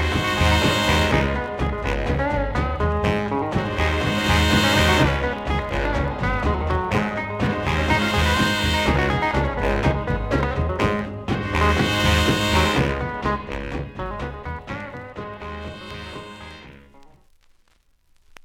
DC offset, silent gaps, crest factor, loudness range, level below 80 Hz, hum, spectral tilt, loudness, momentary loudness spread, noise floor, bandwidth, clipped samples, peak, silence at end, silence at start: under 0.1%; none; 16 dB; 13 LU; -30 dBFS; none; -5 dB/octave; -21 LUFS; 15 LU; -60 dBFS; 17 kHz; under 0.1%; -6 dBFS; 1.4 s; 0 s